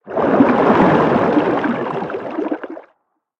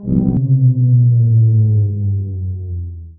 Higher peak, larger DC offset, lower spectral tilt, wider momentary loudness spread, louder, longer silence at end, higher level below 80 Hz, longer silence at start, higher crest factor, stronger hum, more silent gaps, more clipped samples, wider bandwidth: about the same, 0 dBFS vs -2 dBFS; neither; second, -8.5 dB/octave vs -16.5 dB/octave; about the same, 13 LU vs 12 LU; about the same, -16 LUFS vs -14 LUFS; first, 0.6 s vs 0.05 s; second, -50 dBFS vs -36 dBFS; about the same, 0.05 s vs 0 s; about the same, 16 dB vs 12 dB; neither; neither; neither; first, 7.4 kHz vs 1 kHz